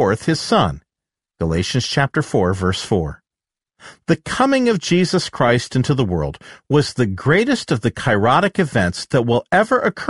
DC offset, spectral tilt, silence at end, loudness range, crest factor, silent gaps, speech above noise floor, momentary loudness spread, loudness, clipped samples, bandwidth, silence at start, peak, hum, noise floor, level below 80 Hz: 0.1%; -5.5 dB/octave; 0 s; 4 LU; 16 dB; none; 71 dB; 6 LU; -18 LUFS; under 0.1%; 11.5 kHz; 0 s; -2 dBFS; none; -89 dBFS; -42 dBFS